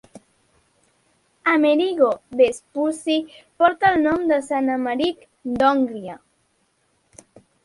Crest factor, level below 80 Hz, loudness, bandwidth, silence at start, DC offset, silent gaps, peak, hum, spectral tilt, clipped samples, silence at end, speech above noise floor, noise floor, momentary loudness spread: 20 dB; -58 dBFS; -20 LUFS; 11.5 kHz; 0.15 s; under 0.1%; none; -2 dBFS; none; -4.5 dB/octave; under 0.1%; 1.5 s; 46 dB; -66 dBFS; 9 LU